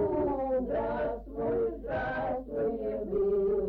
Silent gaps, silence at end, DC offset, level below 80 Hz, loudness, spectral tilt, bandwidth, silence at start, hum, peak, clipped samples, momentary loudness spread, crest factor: none; 0 s; under 0.1%; -48 dBFS; -31 LUFS; -10 dB/octave; 4.9 kHz; 0 s; none; -20 dBFS; under 0.1%; 5 LU; 10 dB